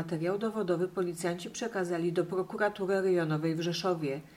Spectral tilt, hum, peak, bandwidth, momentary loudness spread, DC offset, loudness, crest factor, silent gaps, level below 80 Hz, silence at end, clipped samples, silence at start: -6 dB/octave; none; -18 dBFS; 15.5 kHz; 5 LU; under 0.1%; -32 LUFS; 14 dB; none; -70 dBFS; 0 s; under 0.1%; 0 s